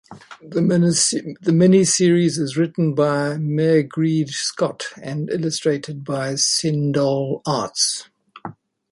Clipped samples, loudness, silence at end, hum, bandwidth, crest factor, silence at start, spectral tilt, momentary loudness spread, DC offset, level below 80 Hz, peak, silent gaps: under 0.1%; -19 LUFS; 0.4 s; none; 11.5 kHz; 16 dB; 0.1 s; -4.5 dB/octave; 12 LU; under 0.1%; -62 dBFS; -4 dBFS; none